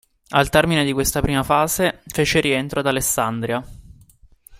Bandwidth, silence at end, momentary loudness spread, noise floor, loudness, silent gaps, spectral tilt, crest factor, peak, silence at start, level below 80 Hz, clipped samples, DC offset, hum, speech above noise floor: 16 kHz; 0.05 s; 6 LU; -50 dBFS; -19 LUFS; none; -4 dB/octave; 20 dB; 0 dBFS; 0.3 s; -38 dBFS; under 0.1%; under 0.1%; none; 31 dB